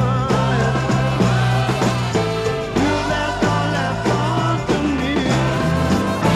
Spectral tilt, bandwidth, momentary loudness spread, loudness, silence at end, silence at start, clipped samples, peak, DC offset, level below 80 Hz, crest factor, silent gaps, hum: -6 dB/octave; 13 kHz; 3 LU; -18 LUFS; 0 s; 0 s; under 0.1%; -4 dBFS; under 0.1%; -34 dBFS; 12 dB; none; none